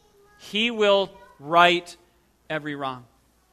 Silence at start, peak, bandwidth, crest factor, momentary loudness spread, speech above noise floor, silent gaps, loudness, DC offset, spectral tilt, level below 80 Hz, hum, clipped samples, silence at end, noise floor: 0.45 s; -2 dBFS; 14 kHz; 24 dB; 15 LU; 28 dB; none; -22 LUFS; under 0.1%; -4 dB/octave; -66 dBFS; none; under 0.1%; 0.5 s; -50 dBFS